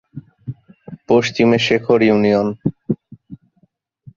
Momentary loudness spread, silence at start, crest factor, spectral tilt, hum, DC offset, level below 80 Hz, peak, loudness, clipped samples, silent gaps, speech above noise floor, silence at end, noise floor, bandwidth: 20 LU; 0.15 s; 16 dB; -6 dB/octave; none; under 0.1%; -54 dBFS; -2 dBFS; -16 LUFS; under 0.1%; none; 46 dB; 0.8 s; -60 dBFS; 7.4 kHz